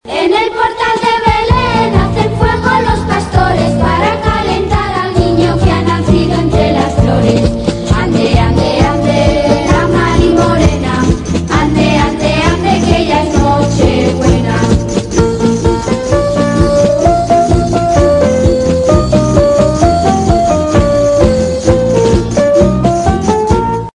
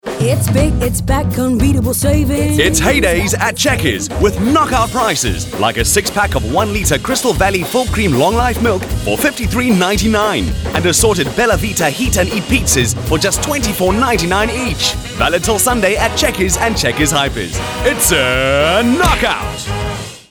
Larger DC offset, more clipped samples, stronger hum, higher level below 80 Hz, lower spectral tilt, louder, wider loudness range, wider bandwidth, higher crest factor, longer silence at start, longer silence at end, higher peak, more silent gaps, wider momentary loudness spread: neither; first, 0.8% vs under 0.1%; neither; about the same, -22 dBFS vs -26 dBFS; first, -6.5 dB/octave vs -4 dB/octave; first, -10 LUFS vs -13 LUFS; about the same, 2 LU vs 1 LU; second, 11 kHz vs over 20 kHz; about the same, 10 dB vs 12 dB; about the same, 0.05 s vs 0.05 s; about the same, 0.1 s vs 0.1 s; about the same, 0 dBFS vs -2 dBFS; neither; about the same, 3 LU vs 5 LU